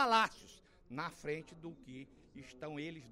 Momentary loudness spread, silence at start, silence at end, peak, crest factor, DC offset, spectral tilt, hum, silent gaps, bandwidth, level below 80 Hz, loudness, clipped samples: 22 LU; 0 s; 0 s; -18 dBFS; 22 dB; under 0.1%; -4 dB/octave; none; none; 16 kHz; -68 dBFS; -39 LUFS; under 0.1%